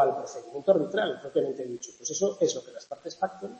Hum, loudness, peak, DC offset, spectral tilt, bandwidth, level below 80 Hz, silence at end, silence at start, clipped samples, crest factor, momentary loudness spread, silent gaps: none; -29 LUFS; -8 dBFS; under 0.1%; -3.5 dB/octave; 8.6 kHz; -76 dBFS; 0 s; 0 s; under 0.1%; 20 dB; 13 LU; none